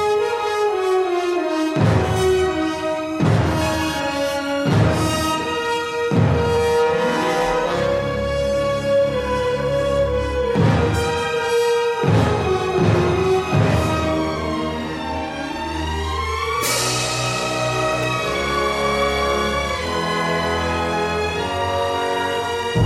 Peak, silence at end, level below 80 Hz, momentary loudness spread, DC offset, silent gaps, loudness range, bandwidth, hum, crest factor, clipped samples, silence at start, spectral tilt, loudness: -4 dBFS; 0 s; -38 dBFS; 5 LU; under 0.1%; none; 3 LU; 16 kHz; none; 16 dB; under 0.1%; 0 s; -5 dB/octave; -20 LUFS